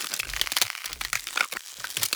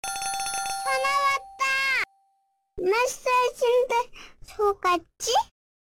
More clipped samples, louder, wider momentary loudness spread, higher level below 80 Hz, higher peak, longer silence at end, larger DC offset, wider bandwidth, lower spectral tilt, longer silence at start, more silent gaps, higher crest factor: neither; about the same, -27 LUFS vs -25 LUFS; about the same, 8 LU vs 8 LU; about the same, -52 dBFS vs -54 dBFS; first, -4 dBFS vs -14 dBFS; second, 0 s vs 0.4 s; neither; first, over 20 kHz vs 17 kHz; second, 1 dB/octave vs -1 dB/octave; about the same, 0 s vs 0.05 s; neither; first, 26 dB vs 12 dB